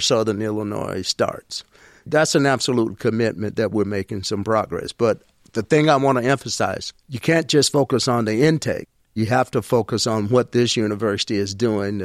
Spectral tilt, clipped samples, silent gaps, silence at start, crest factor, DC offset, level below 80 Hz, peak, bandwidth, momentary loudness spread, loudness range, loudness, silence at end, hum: -4.5 dB/octave; under 0.1%; none; 0 s; 16 dB; under 0.1%; -54 dBFS; -4 dBFS; 15 kHz; 9 LU; 2 LU; -20 LUFS; 0 s; none